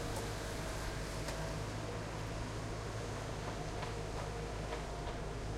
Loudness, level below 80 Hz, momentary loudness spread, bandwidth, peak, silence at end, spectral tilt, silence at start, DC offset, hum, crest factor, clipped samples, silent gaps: -42 LUFS; -48 dBFS; 2 LU; 16.5 kHz; -26 dBFS; 0 s; -5 dB/octave; 0 s; under 0.1%; none; 14 dB; under 0.1%; none